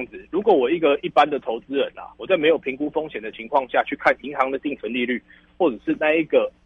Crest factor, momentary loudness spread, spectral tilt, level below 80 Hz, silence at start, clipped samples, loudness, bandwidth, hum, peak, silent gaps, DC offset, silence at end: 18 dB; 9 LU; -6.5 dB/octave; -58 dBFS; 0 s; under 0.1%; -22 LUFS; 7 kHz; none; -4 dBFS; none; under 0.1%; 0.15 s